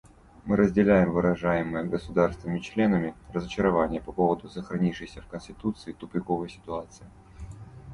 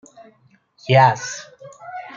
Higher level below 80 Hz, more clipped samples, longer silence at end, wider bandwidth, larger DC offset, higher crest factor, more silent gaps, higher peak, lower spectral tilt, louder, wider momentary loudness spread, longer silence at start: first, -48 dBFS vs -64 dBFS; neither; second, 0 s vs 0.15 s; first, 11 kHz vs 7.4 kHz; neither; about the same, 20 dB vs 20 dB; neither; second, -6 dBFS vs -2 dBFS; first, -8 dB/octave vs -5 dB/octave; second, -27 LUFS vs -17 LUFS; second, 19 LU vs 22 LU; second, 0.45 s vs 0.9 s